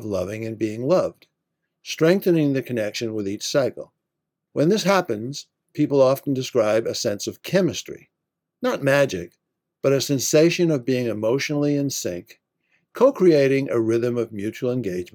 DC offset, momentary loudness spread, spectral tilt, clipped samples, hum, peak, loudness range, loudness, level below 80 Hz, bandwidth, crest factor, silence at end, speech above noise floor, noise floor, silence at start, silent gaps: under 0.1%; 14 LU; -5 dB/octave; under 0.1%; none; -4 dBFS; 3 LU; -21 LUFS; -70 dBFS; 18 kHz; 18 dB; 0.1 s; 61 dB; -82 dBFS; 0 s; none